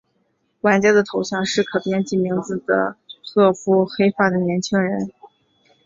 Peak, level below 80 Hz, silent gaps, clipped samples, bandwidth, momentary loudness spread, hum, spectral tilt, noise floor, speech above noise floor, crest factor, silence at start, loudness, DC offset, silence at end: -2 dBFS; -60 dBFS; none; under 0.1%; 7.8 kHz; 8 LU; none; -5.5 dB/octave; -67 dBFS; 49 dB; 18 dB; 0.65 s; -19 LUFS; under 0.1%; 0.6 s